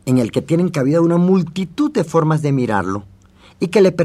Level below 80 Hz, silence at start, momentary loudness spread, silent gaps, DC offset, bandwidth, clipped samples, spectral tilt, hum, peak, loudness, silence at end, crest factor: -54 dBFS; 0.05 s; 8 LU; none; under 0.1%; 13.5 kHz; under 0.1%; -7.5 dB/octave; none; -2 dBFS; -17 LUFS; 0 s; 14 dB